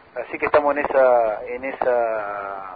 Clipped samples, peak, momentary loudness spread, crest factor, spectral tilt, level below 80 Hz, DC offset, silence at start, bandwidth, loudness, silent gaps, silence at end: under 0.1%; -4 dBFS; 12 LU; 16 dB; -9.5 dB/octave; -56 dBFS; under 0.1%; 0.15 s; 4.9 kHz; -20 LUFS; none; 0 s